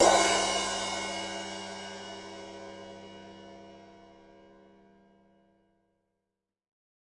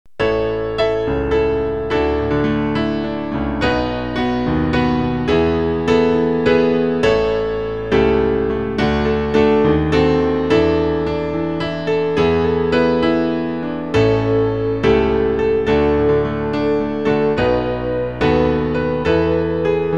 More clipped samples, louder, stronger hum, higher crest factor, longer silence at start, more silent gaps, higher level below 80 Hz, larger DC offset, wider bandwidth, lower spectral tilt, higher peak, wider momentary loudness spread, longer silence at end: neither; second, -30 LUFS vs -17 LUFS; neither; first, 24 dB vs 16 dB; second, 0 s vs 0.2 s; neither; second, -62 dBFS vs -32 dBFS; second, under 0.1% vs 1%; first, 11.5 kHz vs 7.6 kHz; second, -1.5 dB/octave vs -7.5 dB/octave; second, -10 dBFS vs -2 dBFS; first, 24 LU vs 6 LU; first, 2.95 s vs 0 s